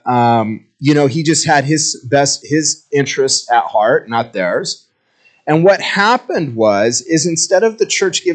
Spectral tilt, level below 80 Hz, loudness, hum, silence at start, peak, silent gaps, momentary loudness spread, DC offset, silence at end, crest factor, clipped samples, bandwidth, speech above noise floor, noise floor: -3.5 dB/octave; -64 dBFS; -14 LUFS; none; 0.05 s; 0 dBFS; none; 6 LU; under 0.1%; 0 s; 14 dB; under 0.1%; 9.4 kHz; 41 dB; -55 dBFS